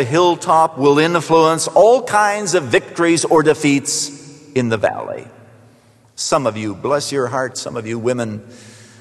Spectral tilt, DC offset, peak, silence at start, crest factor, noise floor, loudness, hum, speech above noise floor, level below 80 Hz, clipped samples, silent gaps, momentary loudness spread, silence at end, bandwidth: -4 dB/octave; under 0.1%; 0 dBFS; 0 s; 16 dB; -50 dBFS; -16 LUFS; none; 34 dB; -58 dBFS; under 0.1%; none; 11 LU; 0.3 s; 12.5 kHz